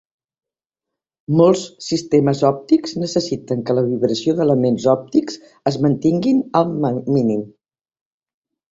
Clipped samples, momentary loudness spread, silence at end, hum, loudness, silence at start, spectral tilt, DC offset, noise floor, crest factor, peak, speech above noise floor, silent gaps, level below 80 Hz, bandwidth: under 0.1%; 8 LU; 1.25 s; none; -18 LUFS; 1.3 s; -7 dB/octave; under 0.1%; -86 dBFS; 16 dB; -2 dBFS; 69 dB; none; -56 dBFS; 8 kHz